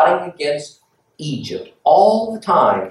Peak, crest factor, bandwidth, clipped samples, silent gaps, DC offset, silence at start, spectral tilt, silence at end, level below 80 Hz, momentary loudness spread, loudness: -2 dBFS; 16 dB; 11.5 kHz; under 0.1%; none; under 0.1%; 0 s; -5.5 dB/octave; 0 s; -66 dBFS; 16 LU; -17 LUFS